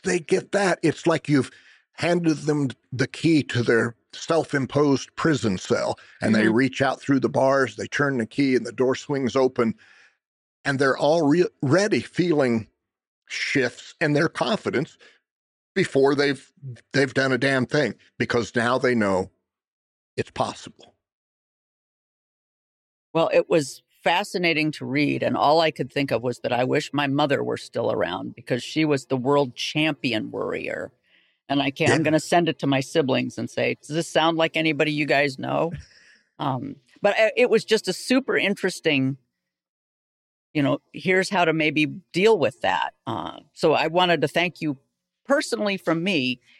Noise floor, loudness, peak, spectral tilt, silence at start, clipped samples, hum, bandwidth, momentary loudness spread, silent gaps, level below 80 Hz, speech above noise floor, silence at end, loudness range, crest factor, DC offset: -63 dBFS; -23 LUFS; -6 dBFS; -5.5 dB/octave; 0.05 s; under 0.1%; none; 13.5 kHz; 9 LU; 10.26-10.64 s, 13.07-13.22 s, 15.31-15.75 s, 19.68-20.17 s, 21.12-23.14 s, 39.69-40.54 s; -64 dBFS; 41 dB; 0.25 s; 3 LU; 18 dB; under 0.1%